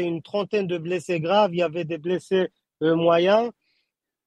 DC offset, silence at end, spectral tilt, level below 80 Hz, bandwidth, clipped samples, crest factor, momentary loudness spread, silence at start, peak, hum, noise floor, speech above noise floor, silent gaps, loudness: under 0.1%; 0.75 s; -6.5 dB/octave; -72 dBFS; 10.5 kHz; under 0.1%; 16 dB; 9 LU; 0 s; -6 dBFS; none; -76 dBFS; 54 dB; none; -23 LUFS